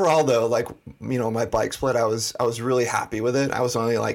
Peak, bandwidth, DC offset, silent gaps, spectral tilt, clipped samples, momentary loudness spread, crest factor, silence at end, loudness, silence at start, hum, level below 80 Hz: -6 dBFS; 17 kHz; under 0.1%; none; -5 dB/octave; under 0.1%; 6 LU; 16 dB; 0 s; -23 LUFS; 0 s; none; -52 dBFS